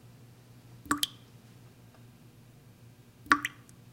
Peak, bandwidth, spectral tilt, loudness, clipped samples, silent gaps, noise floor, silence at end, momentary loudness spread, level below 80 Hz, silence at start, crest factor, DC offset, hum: -4 dBFS; 16.5 kHz; -2 dB/octave; -30 LUFS; under 0.1%; none; -56 dBFS; 0.4 s; 27 LU; -64 dBFS; 0.75 s; 34 dB; under 0.1%; none